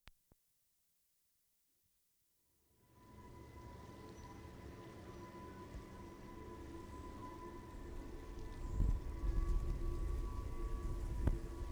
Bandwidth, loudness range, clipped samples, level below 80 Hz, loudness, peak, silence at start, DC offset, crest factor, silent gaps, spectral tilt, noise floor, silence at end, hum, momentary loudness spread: 20 kHz; 17 LU; under 0.1%; -46 dBFS; -47 LUFS; -20 dBFS; 0.05 s; under 0.1%; 26 dB; none; -7 dB/octave; -80 dBFS; 0 s; none; 14 LU